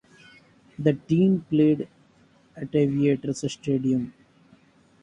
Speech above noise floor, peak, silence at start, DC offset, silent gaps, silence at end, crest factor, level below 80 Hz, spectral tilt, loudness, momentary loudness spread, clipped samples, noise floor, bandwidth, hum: 36 dB; -6 dBFS; 0.8 s; under 0.1%; none; 0.95 s; 18 dB; -60 dBFS; -7.5 dB/octave; -24 LUFS; 9 LU; under 0.1%; -59 dBFS; 9.8 kHz; none